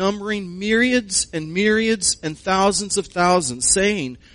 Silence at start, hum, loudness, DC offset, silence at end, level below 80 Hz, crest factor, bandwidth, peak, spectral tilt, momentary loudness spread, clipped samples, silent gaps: 0 s; none; -19 LUFS; under 0.1%; 0.2 s; -46 dBFS; 18 dB; 11 kHz; -2 dBFS; -3 dB/octave; 8 LU; under 0.1%; none